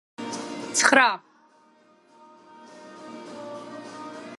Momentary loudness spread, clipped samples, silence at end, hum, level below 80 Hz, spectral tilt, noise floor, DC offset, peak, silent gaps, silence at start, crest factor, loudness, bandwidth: 25 LU; under 0.1%; 0.05 s; none; -76 dBFS; -1 dB/octave; -58 dBFS; under 0.1%; -2 dBFS; none; 0.2 s; 26 dB; -22 LUFS; 12 kHz